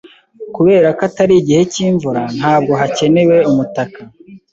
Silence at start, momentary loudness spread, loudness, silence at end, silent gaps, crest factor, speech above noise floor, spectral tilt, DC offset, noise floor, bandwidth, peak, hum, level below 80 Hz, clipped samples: 0.4 s; 9 LU; -12 LUFS; 0.15 s; none; 12 dB; 21 dB; -6 dB/octave; under 0.1%; -33 dBFS; 7.8 kHz; 0 dBFS; none; -50 dBFS; under 0.1%